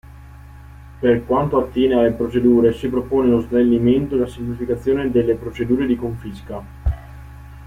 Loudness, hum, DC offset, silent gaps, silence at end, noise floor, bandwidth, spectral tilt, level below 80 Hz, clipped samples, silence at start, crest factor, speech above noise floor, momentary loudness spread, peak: -18 LUFS; none; under 0.1%; none; 0 s; -39 dBFS; 10.5 kHz; -8.5 dB/octave; -34 dBFS; under 0.1%; 0.15 s; 14 dB; 22 dB; 16 LU; -4 dBFS